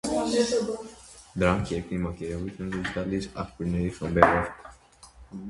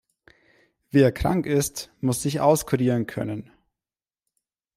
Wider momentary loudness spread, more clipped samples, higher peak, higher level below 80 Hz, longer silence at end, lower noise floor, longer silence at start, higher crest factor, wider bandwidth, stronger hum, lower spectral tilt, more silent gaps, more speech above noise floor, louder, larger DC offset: first, 17 LU vs 10 LU; neither; first, 0 dBFS vs -6 dBFS; about the same, -44 dBFS vs -48 dBFS; second, 0 s vs 1.35 s; second, -52 dBFS vs under -90 dBFS; second, 0.05 s vs 0.95 s; first, 28 dB vs 20 dB; second, 11.5 kHz vs 16 kHz; neither; about the same, -5.5 dB/octave vs -6 dB/octave; neither; second, 26 dB vs over 68 dB; second, -27 LUFS vs -23 LUFS; neither